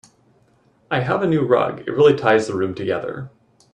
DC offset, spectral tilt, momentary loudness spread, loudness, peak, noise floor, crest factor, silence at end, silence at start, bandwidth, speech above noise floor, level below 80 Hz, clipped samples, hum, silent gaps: under 0.1%; -6.5 dB/octave; 12 LU; -19 LUFS; -2 dBFS; -58 dBFS; 18 dB; 0.45 s; 0.9 s; 10 kHz; 40 dB; -60 dBFS; under 0.1%; none; none